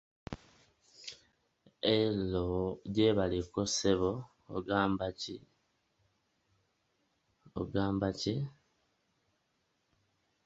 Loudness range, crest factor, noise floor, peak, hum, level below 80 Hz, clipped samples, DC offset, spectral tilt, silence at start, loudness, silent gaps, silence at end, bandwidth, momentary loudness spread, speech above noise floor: 7 LU; 24 dB; -79 dBFS; -14 dBFS; none; -56 dBFS; under 0.1%; under 0.1%; -5 dB/octave; 0.3 s; -33 LUFS; none; 1.95 s; 8.2 kHz; 19 LU; 46 dB